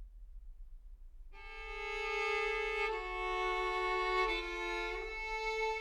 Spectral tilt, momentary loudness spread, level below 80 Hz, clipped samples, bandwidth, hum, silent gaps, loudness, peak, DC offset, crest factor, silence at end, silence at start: -3.5 dB/octave; 11 LU; -52 dBFS; under 0.1%; 14 kHz; none; none; -36 LUFS; -22 dBFS; under 0.1%; 16 dB; 0 s; 0 s